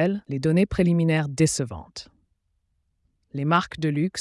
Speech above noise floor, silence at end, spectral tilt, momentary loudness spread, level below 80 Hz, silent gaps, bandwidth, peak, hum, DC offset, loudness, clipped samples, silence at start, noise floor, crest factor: 49 dB; 0 s; -6 dB/octave; 16 LU; -48 dBFS; none; 12 kHz; -8 dBFS; none; under 0.1%; -23 LUFS; under 0.1%; 0 s; -72 dBFS; 16 dB